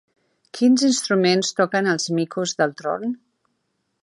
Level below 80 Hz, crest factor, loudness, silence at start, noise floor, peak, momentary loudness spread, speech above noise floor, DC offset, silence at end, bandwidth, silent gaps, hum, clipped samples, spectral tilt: -74 dBFS; 18 dB; -20 LUFS; 0.55 s; -73 dBFS; -4 dBFS; 10 LU; 53 dB; under 0.1%; 0.9 s; 11.5 kHz; none; none; under 0.1%; -4 dB/octave